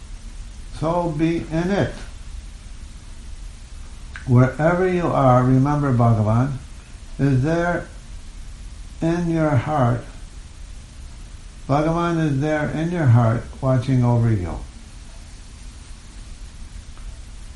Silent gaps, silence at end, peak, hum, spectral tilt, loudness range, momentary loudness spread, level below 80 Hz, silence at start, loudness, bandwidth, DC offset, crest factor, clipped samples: none; 0 s; -4 dBFS; none; -8 dB/octave; 7 LU; 24 LU; -36 dBFS; 0 s; -20 LUFS; 11.5 kHz; under 0.1%; 18 dB; under 0.1%